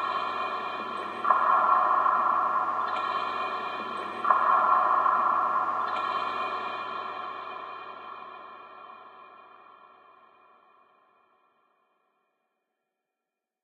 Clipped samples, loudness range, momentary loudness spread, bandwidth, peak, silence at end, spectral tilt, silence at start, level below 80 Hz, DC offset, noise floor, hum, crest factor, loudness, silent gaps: under 0.1%; 17 LU; 20 LU; 8.6 kHz; -8 dBFS; 4.15 s; -4 dB/octave; 0 s; -88 dBFS; under 0.1%; -88 dBFS; none; 22 dB; -26 LUFS; none